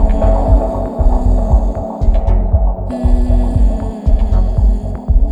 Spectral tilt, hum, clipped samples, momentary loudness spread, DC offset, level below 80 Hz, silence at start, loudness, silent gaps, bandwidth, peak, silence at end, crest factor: -10 dB/octave; none; under 0.1%; 5 LU; under 0.1%; -12 dBFS; 0 s; -16 LUFS; none; 3.5 kHz; 0 dBFS; 0 s; 10 dB